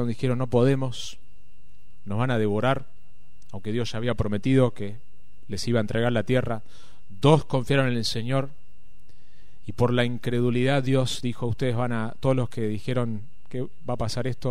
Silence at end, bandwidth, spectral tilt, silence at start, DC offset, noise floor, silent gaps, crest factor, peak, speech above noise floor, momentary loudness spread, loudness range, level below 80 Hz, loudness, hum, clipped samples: 0 s; 13 kHz; -6.5 dB/octave; 0 s; 3%; -57 dBFS; none; 20 dB; -4 dBFS; 32 dB; 14 LU; 3 LU; -50 dBFS; -25 LUFS; none; under 0.1%